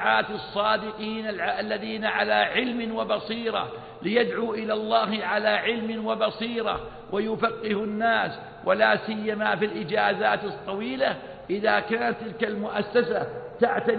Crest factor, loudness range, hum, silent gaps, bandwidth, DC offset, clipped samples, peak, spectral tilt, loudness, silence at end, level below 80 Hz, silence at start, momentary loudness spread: 18 dB; 2 LU; none; none; 4.8 kHz; under 0.1%; under 0.1%; -8 dBFS; -9 dB/octave; -26 LUFS; 0 s; -58 dBFS; 0 s; 8 LU